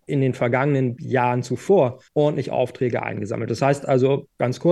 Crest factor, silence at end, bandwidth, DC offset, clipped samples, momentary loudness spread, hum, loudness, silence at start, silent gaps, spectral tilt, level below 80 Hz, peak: 16 dB; 0 s; 12 kHz; under 0.1%; under 0.1%; 7 LU; none; -21 LUFS; 0.1 s; none; -7.5 dB/octave; -62 dBFS; -6 dBFS